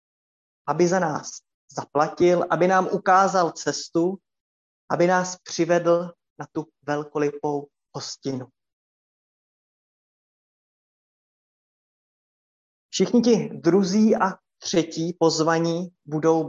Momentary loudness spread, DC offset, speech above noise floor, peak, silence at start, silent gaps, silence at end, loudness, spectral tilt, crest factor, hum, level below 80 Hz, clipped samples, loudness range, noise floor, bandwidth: 15 LU; under 0.1%; over 68 dB; -6 dBFS; 0.65 s; 1.54-1.68 s, 4.40-4.88 s, 6.30-6.36 s, 8.73-12.89 s; 0 s; -22 LUFS; -5 dB/octave; 18 dB; none; -68 dBFS; under 0.1%; 13 LU; under -90 dBFS; 7.8 kHz